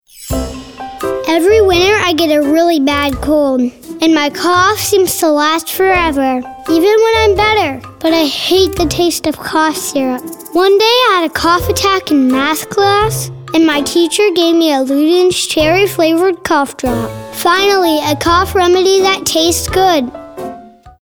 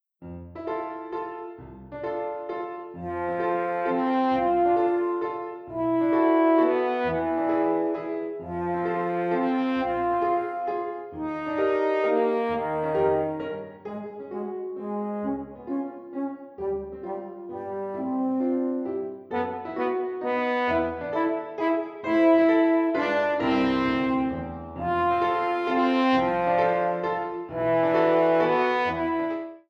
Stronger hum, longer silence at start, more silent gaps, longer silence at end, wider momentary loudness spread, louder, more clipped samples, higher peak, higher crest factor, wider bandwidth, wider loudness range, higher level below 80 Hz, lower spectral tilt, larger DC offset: neither; about the same, 0.15 s vs 0.2 s; neither; about the same, 0.1 s vs 0.1 s; second, 9 LU vs 13 LU; first, -11 LUFS vs -26 LUFS; neither; first, 0 dBFS vs -10 dBFS; second, 10 dB vs 16 dB; first, over 20 kHz vs 6.2 kHz; second, 1 LU vs 9 LU; first, -34 dBFS vs -56 dBFS; second, -3.5 dB/octave vs -7.5 dB/octave; first, 0.3% vs under 0.1%